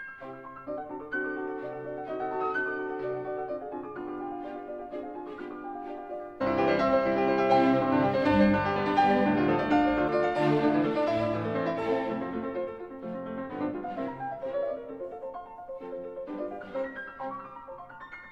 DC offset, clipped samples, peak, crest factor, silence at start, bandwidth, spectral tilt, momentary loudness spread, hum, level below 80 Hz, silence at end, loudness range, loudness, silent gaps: under 0.1%; under 0.1%; -10 dBFS; 18 dB; 0 s; 8 kHz; -8 dB/octave; 16 LU; none; -56 dBFS; 0 s; 12 LU; -29 LUFS; none